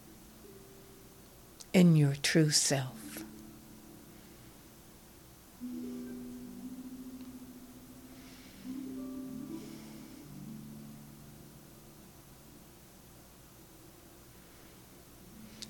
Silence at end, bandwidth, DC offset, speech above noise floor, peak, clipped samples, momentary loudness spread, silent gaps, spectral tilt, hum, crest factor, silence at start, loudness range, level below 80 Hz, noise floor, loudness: 0 s; 18 kHz; under 0.1%; 29 dB; -14 dBFS; under 0.1%; 27 LU; none; -4.5 dB/octave; none; 24 dB; 0 s; 24 LU; -64 dBFS; -56 dBFS; -32 LUFS